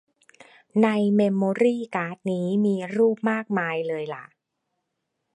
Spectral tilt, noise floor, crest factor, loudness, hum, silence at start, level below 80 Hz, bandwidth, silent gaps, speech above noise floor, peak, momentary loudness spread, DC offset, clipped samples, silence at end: -7.5 dB/octave; -79 dBFS; 18 dB; -24 LUFS; none; 0.75 s; -74 dBFS; 10 kHz; none; 56 dB; -8 dBFS; 8 LU; under 0.1%; under 0.1%; 1.1 s